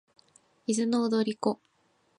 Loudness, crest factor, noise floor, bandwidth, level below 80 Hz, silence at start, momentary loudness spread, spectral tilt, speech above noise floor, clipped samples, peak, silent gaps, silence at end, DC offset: -29 LUFS; 18 dB; -63 dBFS; 11 kHz; -80 dBFS; 0.7 s; 11 LU; -5 dB/octave; 36 dB; under 0.1%; -12 dBFS; none; 0.65 s; under 0.1%